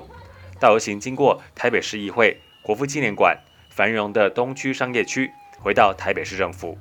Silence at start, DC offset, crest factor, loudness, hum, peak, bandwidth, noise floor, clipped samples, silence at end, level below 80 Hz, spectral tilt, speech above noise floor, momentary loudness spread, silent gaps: 0 s; under 0.1%; 22 dB; -21 LUFS; none; 0 dBFS; 18 kHz; -42 dBFS; under 0.1%; 0 s; -54 dBFS; -4 dB/octave; 21 dB; 9 LU; none